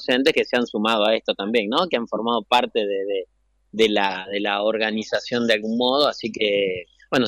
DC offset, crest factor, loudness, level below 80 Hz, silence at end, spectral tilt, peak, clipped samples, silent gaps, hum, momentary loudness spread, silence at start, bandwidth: under 0.1%; 16 dB; -21 LUFS; -62 dBFS; 0 s; -4 dB/octave; -6 dBFS; under 0.1%; none; none; 7 LU; 0 s; 15.5 kHz